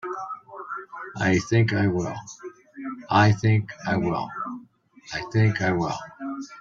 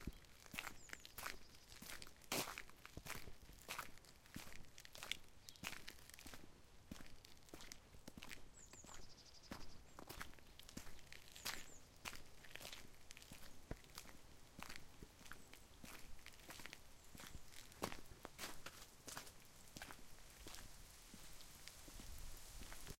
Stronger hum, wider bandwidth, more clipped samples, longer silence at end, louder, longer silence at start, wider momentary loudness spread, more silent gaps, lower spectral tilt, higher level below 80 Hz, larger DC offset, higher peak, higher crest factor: neither; second, 7.6 kHz vs 16.5 kHz; neither; about the same, 0 s vs 0.05 s; first, -24 LUFS vs -55 LUFS; about the same, 0.05 s vs 0 s; first, 18 LU vs 11 LU; neither; first, -6.5 dB/octave vs -2.5 dB/octave; first, -56 dBFS vs -64 dBFS; neither; first, -4 dBFS vs -24 dBFS; second, 20 dB vs 32 dB